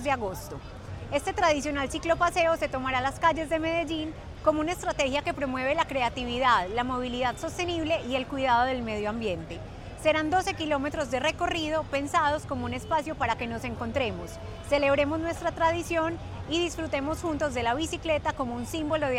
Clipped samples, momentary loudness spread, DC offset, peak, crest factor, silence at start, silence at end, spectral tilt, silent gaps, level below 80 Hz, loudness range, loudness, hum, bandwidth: under 0.1%; 8 LU; under 0.1%; -10 dBFS; 18 dB; 0 s; 0 s; -4.5 dB/octave; none; -46 dBFS; 2 LU; -28 LUFS; none; 16 kHz